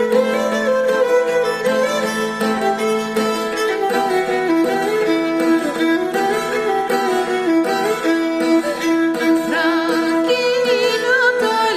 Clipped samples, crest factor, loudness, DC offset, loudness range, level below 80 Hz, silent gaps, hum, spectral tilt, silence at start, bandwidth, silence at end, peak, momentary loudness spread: under 0.1%; 12 dB; -17 LUFS; under 0.1%; 2 LU; -56 dBFS; none; none; -4 dB/octave; 0 s; 15.5 kHz; 0 s; -4 dBFS; 3 LU